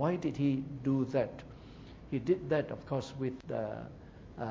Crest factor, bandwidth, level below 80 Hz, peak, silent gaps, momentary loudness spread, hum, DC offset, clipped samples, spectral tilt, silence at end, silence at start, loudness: 16 dB; 7.6 kHz; -58 dBFS; -18 dBFS; none; 20 LU; none; under 0.1%; under 0.1%; -8 dB/octave; 0 s; 0 s; -35 LUFS